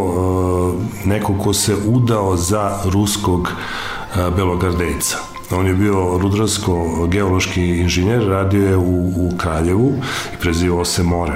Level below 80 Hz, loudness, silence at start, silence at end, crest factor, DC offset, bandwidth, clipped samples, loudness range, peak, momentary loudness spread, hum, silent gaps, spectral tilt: -34 dBFS; -17 LUFS; 0 s; 0 s; 12 dB; 0.4%; 16 kHz; under 0.1%; 2 LU; -6 dBFS; 5 LU; none; none; -5.5 dB/octave